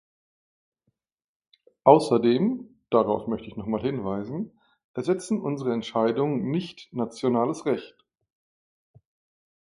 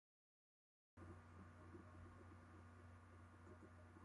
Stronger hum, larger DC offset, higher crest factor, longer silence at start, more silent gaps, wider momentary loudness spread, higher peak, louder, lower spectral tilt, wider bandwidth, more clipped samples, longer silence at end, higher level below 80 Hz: neither; neither; first, 26 dB vs 14 dB; first, 1.85 s vs 0.95 s; first, 4.84-4.94 s vs none; first, 14 LU vs 3 LU; first, -2 dBFS vs -48 dBFS; first, -25 LUFS vs -64 LUFS; about the same, -7 dB/octave vs -7 dB/octave; about the same, 11.5 kHz vs 11 kHz; neither; first, 1.8 s vs 0 s; first, -62 dBFS vs -70 dBFS